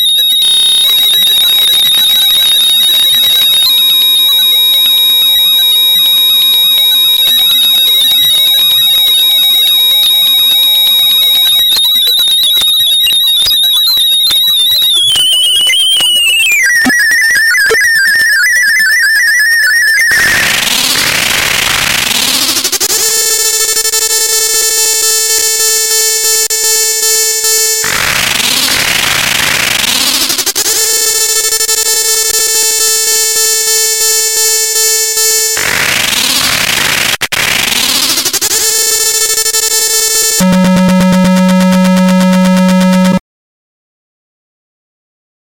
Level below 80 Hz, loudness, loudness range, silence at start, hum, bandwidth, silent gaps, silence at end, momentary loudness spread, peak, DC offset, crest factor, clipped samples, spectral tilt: -42 dBFS; -6 LUFS; 4 LU; 0 s; none; 17 kHz; none; 2.3 s; 4 LU; 0 dBFS; under 0.1%; 8 dB; under 0.1%; -1 dB/octave